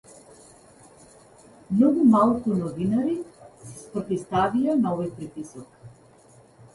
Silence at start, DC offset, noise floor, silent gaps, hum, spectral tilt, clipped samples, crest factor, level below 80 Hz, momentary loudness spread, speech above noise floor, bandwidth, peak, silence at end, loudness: 1.7 s; under 0.1%; -54 dBFS; none; none; -7.5 dB/octave; under 0.1%; 18 dB; -58 dBFS; 23 LU; 31 dB; 11.5 kHz; -8 dBFS; 0.85 s; -23 LUFS